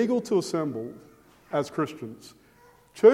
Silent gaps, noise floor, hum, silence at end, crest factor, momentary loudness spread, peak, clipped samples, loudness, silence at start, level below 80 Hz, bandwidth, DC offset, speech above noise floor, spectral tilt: none; -57 dBFS; none; 0 s; 22 dB; 22 LU; -4 dBFS; under 0.1%; -27 LUFS; 0 s; -70 dBFS; 12.5 kHz; under 0.1%; 29 dB; -6 dB/octave